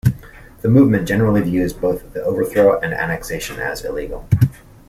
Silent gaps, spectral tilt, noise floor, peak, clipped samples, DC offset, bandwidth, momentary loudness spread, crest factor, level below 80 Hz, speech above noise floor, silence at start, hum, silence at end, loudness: none; -7.5 dB/octave; -39 dBFS; -2 dBFS; under 0.1%; under 0.1%; 15.5 kHz; 11 LU; 16 dB; -38 dBFS; 23 dB; 0.05 s; none; 0.35 s; -18 LUFS